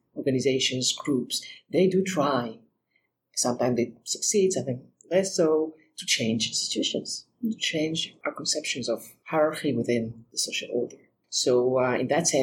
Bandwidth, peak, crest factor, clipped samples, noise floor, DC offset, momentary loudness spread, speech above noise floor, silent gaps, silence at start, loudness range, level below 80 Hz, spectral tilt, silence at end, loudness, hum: 17 kHz; -10 dBFS; 16 dB; under 0.1%; -74 dBFS; under 0.1%; 9 LU; 48 dB; none; 0.15 s; 2 LU; -70 dBFS; -3.5 dB/octave; 0 s; -26 LUFS; none